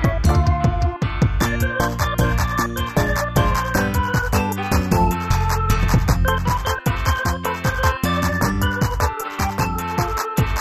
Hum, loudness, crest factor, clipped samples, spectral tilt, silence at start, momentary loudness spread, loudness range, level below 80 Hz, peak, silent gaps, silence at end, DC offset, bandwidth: none; -20 LUFS; 14 dB; under 0.1%; -5.5 dB/octave; 0 s; 4 LU; 2 LU; -24 dBFS; -4 dBFS; none; 0 s; 0.3%; 15.5 kHz